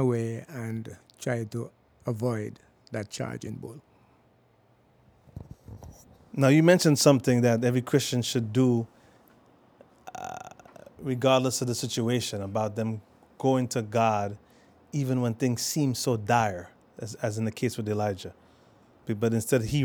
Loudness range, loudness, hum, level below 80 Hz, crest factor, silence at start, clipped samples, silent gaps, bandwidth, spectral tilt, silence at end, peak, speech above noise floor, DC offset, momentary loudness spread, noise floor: 13 LU; -27 LUFS; none; -62 dBFS; 24 dB; 0 s; under 0.1%; none; over 20 kHz; -5.5 dB/octave; 0 s; -4 dBFS; 37 dB; under 0.1%; 21 LU; -63 dBFS